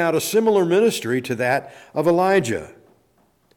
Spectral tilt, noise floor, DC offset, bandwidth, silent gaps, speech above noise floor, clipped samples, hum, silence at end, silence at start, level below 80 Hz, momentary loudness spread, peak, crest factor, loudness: -5 dB/octave; -61 dBFS; under 0.1%; 18.5 kHz; none; 42 dB; under 0.1%; none; 0.85 s; 0 s; -60 dBFS; 9 LU; -6 dBFS; 14 dB; -20 LUFS